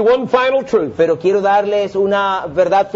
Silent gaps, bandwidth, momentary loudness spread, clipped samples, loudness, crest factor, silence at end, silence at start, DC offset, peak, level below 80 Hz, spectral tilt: none; 7.6 kHz; 3 LU; under 0.1%; -15 LUFS; 14 dB; 0 s; 0 s; under 0.1%; 0 dBFS; -52 dBFS; -6 dB/octave